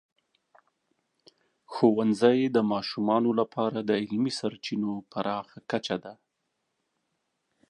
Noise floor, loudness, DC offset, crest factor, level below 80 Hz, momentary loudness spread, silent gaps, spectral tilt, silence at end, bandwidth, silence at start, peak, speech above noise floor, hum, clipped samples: -80 dBFS; -27 LUFS; under 0.1%; 20 dB; -74 dBFS; 11 LU; none; -6 dB/octave; 1.55 s; 11 kHz; 1.7 s; -8 dBFS; 53 dB; none; under 0.1%